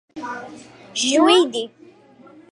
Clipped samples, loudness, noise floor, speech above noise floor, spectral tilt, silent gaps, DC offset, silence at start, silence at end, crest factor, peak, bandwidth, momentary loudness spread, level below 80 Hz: under 0.1%; -17 LUFS; -48 dBFS; 28 dB; -1.5 dB/octave; none; under 0.1%; 0.15 s; 0.85 s; 18 dB; -2 dBFS; 11.5 kHz; 20 LU; -70 dBFS